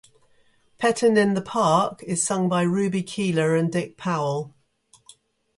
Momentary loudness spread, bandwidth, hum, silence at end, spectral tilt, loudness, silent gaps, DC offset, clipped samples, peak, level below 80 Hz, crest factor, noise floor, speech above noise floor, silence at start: 8 LU; 11.5 kHz; none; 1.1 s; -5 dB/octave; -23 LUFS; none; under 0.1%; under 0.1%; -6 dBFS; -64 dBFS; 18 dB; -60 dBFS; 38 dB; 0.8 s